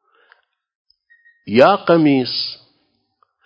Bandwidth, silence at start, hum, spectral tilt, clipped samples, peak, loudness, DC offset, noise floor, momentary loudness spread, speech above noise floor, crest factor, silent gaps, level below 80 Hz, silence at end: 8 kHz; 1.45 s; none; -7.5 dB/octave; under 0.1%; 0 dBFS; -15 LUFS; under 0.1%; -66 dBFS; 13 LU; 52 dB; 18 dB; none; -64 dBFS; 0.9 s